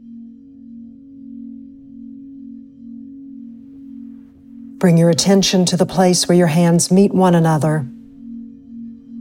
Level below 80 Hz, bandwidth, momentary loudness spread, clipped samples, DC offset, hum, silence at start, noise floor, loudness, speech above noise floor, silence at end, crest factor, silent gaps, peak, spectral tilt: -54 dBFS; 16.5 kHz; 25 LU; under 0.1%; under 0.1%; none; 0.1 s; -39 dBFS; -14 LUFS; 26 dB; 0 s; 16 dB; none; -2 dBFS; -5.5 dB/octave